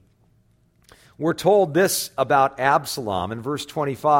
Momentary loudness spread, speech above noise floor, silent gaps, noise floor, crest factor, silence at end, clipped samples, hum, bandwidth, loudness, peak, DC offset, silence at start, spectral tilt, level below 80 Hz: 9 LU; 40 dB; none; -61 dBFS; 18 dB; 0 s; under 0.1%; none; 16.5 kHz; -21 LUFS; -4 dBFS; under 0.1%; 1.2 s; -4.5 dB/octave; -58 dBFS